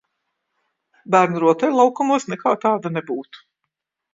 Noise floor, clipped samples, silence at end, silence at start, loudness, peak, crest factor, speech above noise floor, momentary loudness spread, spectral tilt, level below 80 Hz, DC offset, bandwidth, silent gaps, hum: -79 dBFS; under 0.1%; 0.75 s; 1.1 s; -19 LUFS; 0 dBFS; 20 dB; 61 dB; 10 LU; -6 dB/octave; -70 dBFS; under 0.1%; 7.8 kHz; none; none